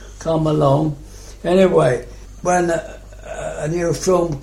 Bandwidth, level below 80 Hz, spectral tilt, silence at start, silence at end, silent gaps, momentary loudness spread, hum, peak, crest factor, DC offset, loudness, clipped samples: 15 kHz; -38 dBFS; -6 dB/octave; 0 s; 0 s; none; 20 LU; none; -2 dBFS; 16 dB; under 0.1%; -18 LUFS; under 0.1%